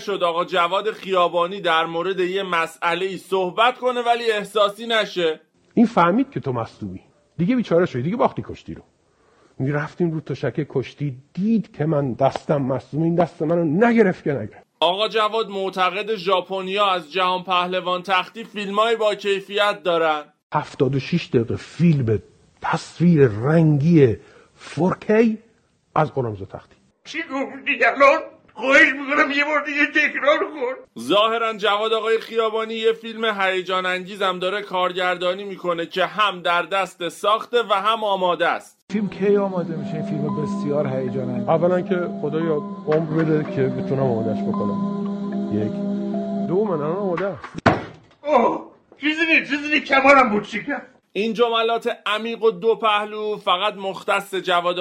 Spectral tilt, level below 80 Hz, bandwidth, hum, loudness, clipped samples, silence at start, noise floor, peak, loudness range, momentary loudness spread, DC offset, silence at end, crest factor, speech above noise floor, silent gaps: -6 dB/octave; -58 dBFS; 13.5 kHz; none; -20 LUFS; under 0.1%; 0 s; -60 dBFS; -2 dBFS; 5 LU; 10 LU; under 0.1%; 0 s; 18 dB; 40 dB; 20.43-20.50 s, 38.82-38.87 s